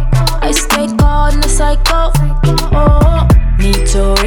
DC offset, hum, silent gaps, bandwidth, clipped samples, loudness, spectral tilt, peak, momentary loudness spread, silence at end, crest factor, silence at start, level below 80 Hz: under 0.1%; none; none; 17.5 kHz; under 0.1%; -12 LUFS; -5 dB/octave; 0 dBFS; 4 LU; 0 s; 8 dB; 0 s; -10 dBFS